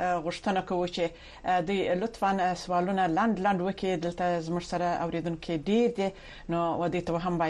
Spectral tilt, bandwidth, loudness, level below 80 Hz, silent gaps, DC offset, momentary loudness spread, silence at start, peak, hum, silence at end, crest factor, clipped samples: -6 dB/octave; 11.5 kHz; -29 LUFS; -52 dBFS; none; under 0.1%; 7 LU; 0 s; -14 dBFS; none; 0 s; 14 dB; under 0.1%